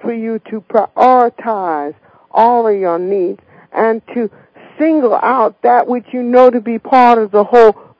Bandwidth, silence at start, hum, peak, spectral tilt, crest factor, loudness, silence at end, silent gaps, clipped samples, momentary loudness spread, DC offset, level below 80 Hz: 8 kHz; 0.05 s; none; 0 dBFS; -7.5 dB/octave; 12 dB; -12 LUFS; 0.3 s; none; 1%; 12 LU; under 0.1%; -58 dBFS